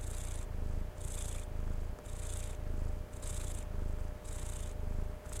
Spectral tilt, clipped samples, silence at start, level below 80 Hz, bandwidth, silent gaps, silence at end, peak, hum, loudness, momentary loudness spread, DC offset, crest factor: -5 dB/octave; under 0.1%; 0 s; -38 dBFS; 15.5 kHz; none; 0 s; -24 dBFS; none; -43 LUFS; 2 LU; under 0.1%; 14 dB